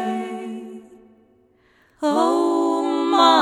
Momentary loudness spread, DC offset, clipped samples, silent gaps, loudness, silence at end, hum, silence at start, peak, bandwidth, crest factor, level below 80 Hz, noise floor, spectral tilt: 19 LU; under 0.1%; under 0.1%; none; -20 LUFS; 0 s; none; 0 s; -2 dBFS; 12 kHz; 20 dB; -70 dBFS; -58 dBFS; -3.5 dB/octave